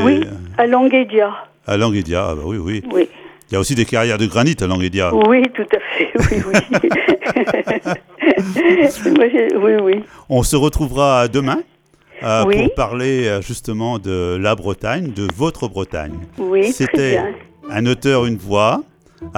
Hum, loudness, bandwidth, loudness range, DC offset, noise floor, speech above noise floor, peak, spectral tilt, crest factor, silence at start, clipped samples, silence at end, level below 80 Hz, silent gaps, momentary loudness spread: none; -16 LUFS; 17.5 kHz; 4 LU; under 0.1%; -41 dBFS; 26 dB; 0 dBFS; -5.5 dB/octave; 14 dB; 0 s; under 0.1%; 0 s; -36 dBFS; none; 10 LU